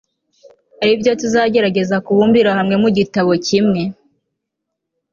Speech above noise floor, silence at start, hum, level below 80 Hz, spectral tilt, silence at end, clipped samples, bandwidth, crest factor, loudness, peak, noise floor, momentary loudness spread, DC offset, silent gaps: 64 dB; 0.8 s; none; -54 dBFS; -5.5 dB/octave; 1.2 s; under 0.1%; 7.4 kHz; 14 dB; -15 LUFS; -2 dBFS; -77 dBFS; 5 LU; under 0.1%; none